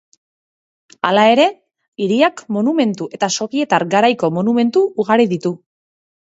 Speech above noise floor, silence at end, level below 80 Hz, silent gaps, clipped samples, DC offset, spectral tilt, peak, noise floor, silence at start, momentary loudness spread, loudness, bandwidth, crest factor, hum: over 75 dB; 0.75 s; -66 dBFS; 1.88-1.92 s; under 0.1%; under 0.1%; -5 dB/octave; 0 dBFS; under -90 dBFS; 1.05 s; 9 LU; -16 LUFS; 8 kHz; 16 dB; none